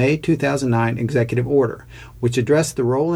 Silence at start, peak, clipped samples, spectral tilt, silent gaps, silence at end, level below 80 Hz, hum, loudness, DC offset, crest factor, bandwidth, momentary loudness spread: 0 s; -6 dBFS; under 0.1%; -6.5 dB/octave; none; 0 s; -46 dBFS; none; -19 LUFS; under 0.1%; 14 dB; 14 kHz; 5 LU